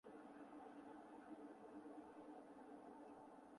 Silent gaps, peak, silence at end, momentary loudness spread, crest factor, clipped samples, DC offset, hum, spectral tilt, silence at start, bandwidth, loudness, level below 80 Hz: none; -46 dBFS; 0 s; 2 LU; 14 dB; under 0.1%; under 0.1%; none; -6 dB/octave; 0.05 s; 11 kHz; -60 LUFS; under -90 dBFS